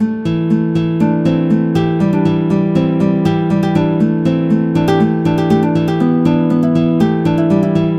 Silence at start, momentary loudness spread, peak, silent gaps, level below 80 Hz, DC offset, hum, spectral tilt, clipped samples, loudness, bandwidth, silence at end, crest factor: 0 s; 2 LU; 0 dBFS; none; -46 dBFS; under 0.1%; none; -9 dB/octave; under 0.1%; -14 LUFS; 8.2 kHz; 0 s; 12 dB